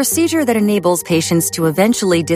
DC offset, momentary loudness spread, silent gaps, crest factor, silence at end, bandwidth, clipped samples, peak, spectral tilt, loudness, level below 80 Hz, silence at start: under 0.1%; 2 LU; none; 14 dB; 0 s; 15.5 kHz; under 0.1%; -2 dBFS; -4.5 dB/octave; -15 LUFS; -52 dBFS; 0 s